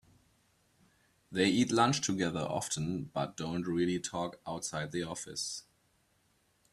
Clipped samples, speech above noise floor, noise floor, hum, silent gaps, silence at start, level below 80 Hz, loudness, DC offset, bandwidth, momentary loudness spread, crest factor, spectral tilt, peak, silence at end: under 0.1%; 39 dB; -72 dBFS; none; none; 1.3 s; -66 dBFS; -33 LUFS; under 0.1%; 13.5 kHz; 11 LU; 22 dB; -4 dB/octave; -12 dBFS; 1.1 s